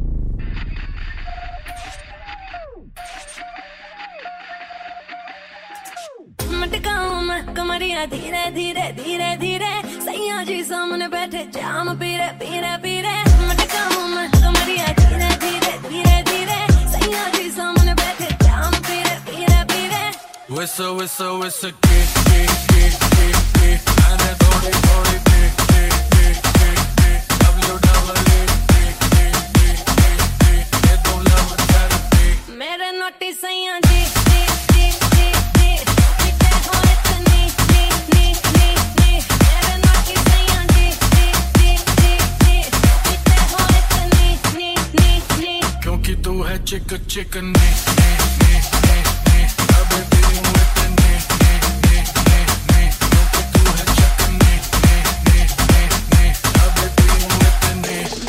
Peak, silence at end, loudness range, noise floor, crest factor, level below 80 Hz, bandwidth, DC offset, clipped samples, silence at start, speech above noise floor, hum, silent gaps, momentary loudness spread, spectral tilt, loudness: 0 dBFS; 0 s; 9 LU; -37 dBFS; 14 dB; -16 dBFS; 16.5 kHz; under 0.1%; under 0.1%; 0 s; 20 dB; none; none; 14 LU; -4.5 dB/octave; -16 LUFS